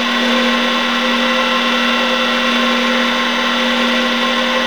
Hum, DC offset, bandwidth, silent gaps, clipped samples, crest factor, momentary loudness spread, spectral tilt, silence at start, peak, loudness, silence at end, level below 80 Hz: none; 0.9%; over 20 kHz; none; under 0.1%; 14 dB; 1 LU; -2 dB/octave; 0 s; -2 dBFS; -13 LUFS; 0 s; -50 dBFS